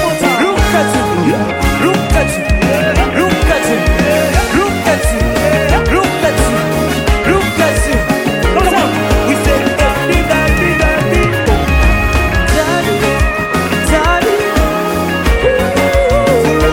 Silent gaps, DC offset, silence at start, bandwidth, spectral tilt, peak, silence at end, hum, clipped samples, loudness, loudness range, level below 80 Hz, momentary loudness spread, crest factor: none; under 0.1%; 0 s; 17 kHz; -5 dB/octave; 0 dBFS; 0 s; none; under 0.1%; -12 LUFS; 1 LU; -18 dBFS; 2 LU; 12 dB